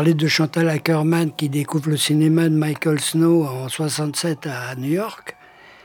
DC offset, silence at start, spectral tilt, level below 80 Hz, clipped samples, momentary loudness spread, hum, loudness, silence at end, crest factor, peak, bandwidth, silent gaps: under 0.1%; 0 s; -5.5 dB/octave; -70 dBFS; under 0.1%; 10 LU; none; -20 LUFS; 0.55 s; 16 dB; -4 dBFS; 18.5 kHz; none